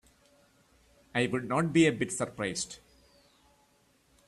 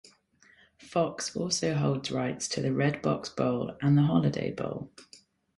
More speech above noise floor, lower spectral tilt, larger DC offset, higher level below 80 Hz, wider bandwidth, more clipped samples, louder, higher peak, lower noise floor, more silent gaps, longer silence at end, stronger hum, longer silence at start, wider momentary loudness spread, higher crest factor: first, 38 dB vs 34 dB; about the same, -4.5 dB/octave vs -5.5 dB/octave; neither; about the same, -66 dBFS vs -62 dBFS; about the same, 12.5 kHz vs 11.5 kHz; neither; about the same, -30 LUFS vs -29 LUFS; about the same, -12 dBFS vs -12 dBFS; first, -67 dBFS vs -62 dBFS; neither; first, 1.5 s vs 0.55 s; neither; first, 1.15 s vs 0.8 s; about the same, 11 LU vs 9 LU; about the same, 20 dB vs 18 dB